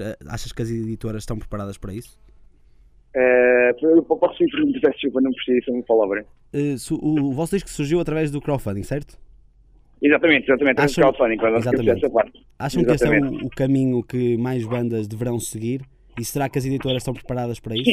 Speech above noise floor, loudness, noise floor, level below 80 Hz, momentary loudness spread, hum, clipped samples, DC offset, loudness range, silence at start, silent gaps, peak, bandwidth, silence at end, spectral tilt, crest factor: 32 dB; -21 LUFS; -52 dBFS; -44 dBFS; 14 LU; none; under 0.1%; under 0.1%; 6 LU; 0 s; none; -2 dBFS; 15.5 kHz; 0 s; -6 dB/octave; 18 dB